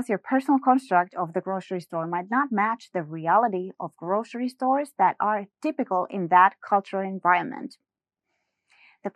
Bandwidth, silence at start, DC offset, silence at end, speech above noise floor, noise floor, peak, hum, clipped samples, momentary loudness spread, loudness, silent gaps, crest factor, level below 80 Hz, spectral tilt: 12.5 kHz; 0 s; under 0.1%; 0.05 s; 56 dB; -81 dBFS; -6 dBFS; none; under 0.1%; 11 LU; -25 LUFS; none; 20 dB; -88 dBFS; -7 dB/octave